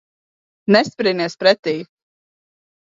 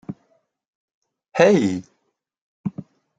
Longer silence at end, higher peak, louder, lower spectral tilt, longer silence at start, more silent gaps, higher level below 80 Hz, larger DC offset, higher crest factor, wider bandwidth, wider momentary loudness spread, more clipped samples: first, 1.1 s vs 0.35 s; about the same, 0 dBFS vs -2 dBFS; first, -17 LUFS vs -20 LUFS; about the same, -5 dB/octave vs -6 dB/octave; first, 0.7 s vs 0.1 s; second, 1.59-1.63 s vs 0.67-0.88 s, 0.94-1.02 s, 2.41-2.64 s; about the same, -68 dBFS vs -66 dBFS; neither; about the same, 20 dB vs 22 dB; second, 7.6 kHz vs 9.2 kHz; second, 11 LU vs 24 LU; neither